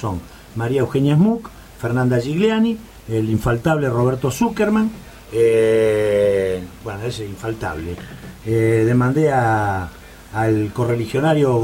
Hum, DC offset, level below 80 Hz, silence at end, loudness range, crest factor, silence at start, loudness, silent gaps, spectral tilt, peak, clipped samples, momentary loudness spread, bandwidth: none; under 0.1%; -42 dBFS; 0 s; 3 LU; 14 dB; 0 s; -19 LUFS; none; -7 dB/octave; -4 dBFS; under 0.1%; 14 LU; 16.5 kHz